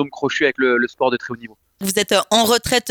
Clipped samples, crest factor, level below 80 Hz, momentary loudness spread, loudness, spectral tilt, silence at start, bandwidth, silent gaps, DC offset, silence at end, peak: under 0.1%; 18 dB; -50 dBFS; 11 LU; -18 LUFS; -2.5 dB/octave; 0 s; over 20 kHz; none; under 0.1%; 0 s; -2 dBFS